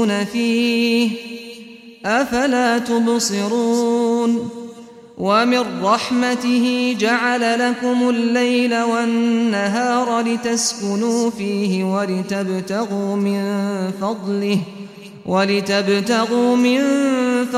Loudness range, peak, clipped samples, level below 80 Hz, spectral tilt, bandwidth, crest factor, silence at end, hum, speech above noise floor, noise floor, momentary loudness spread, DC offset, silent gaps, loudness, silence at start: 4 LU; -2 dBFS; under 0.1%; -60 dBFS; -4.5 dB/octave; 14.5 kHz; 16 dB; 0 s; none; 21 dB; -39 dBFS; 6 LU; under 0.1%; none; -18 LUFS; 0 s